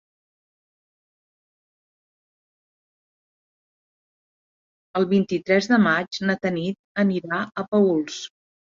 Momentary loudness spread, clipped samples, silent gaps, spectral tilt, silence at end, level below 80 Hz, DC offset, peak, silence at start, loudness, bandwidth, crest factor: 11 LU; under 0.1%; 6.79-6.95 s, 7.68-7.72 s; -6 dB/octave; 0.45 s; -68 dBFS; under 0.1%; -6 dBFS; 4.95 s; -22 LUFS; 7.6 kHz; 20 dB